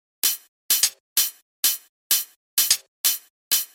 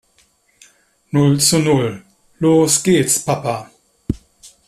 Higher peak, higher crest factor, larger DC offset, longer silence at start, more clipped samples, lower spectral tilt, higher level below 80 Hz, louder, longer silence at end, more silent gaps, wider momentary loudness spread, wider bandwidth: second, -4 dBFS vs 0 dBFS; about the same, 20 dB vs 16 dB; neither; second, 0.25 s vs 1.15 s; neither; second, 4 dB/octave vs -4.5 dB/octave; second, -84 dBFS vs -44 dBFS; second, -22 LUFS vs -16 LUFS; about the same, 0.1 s vs 0.2 s; first, 0.48-0.69 s, 1.00-1.16 s, 1.42-1.63 s, 1.89-2.10 s, 2.36-2.57 s, 2.88-3.04 s, 3.30-3.51 s vs none; second, 6 LU vs 15 LU; first, 17 kHz vs 14.5 kHz